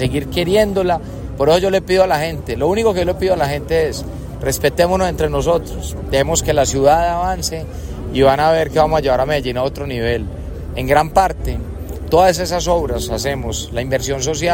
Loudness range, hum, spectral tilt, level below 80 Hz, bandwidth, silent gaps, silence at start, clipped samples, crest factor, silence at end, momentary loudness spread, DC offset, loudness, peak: 2 LU; none; -4.5 dB/octave; -30 dBFS; 16.5 kHz; none; 0 s; under 0.1%; 16 dB; 0 s; 11 LU; under 0.1%; -17 LUFS; 0 dBFS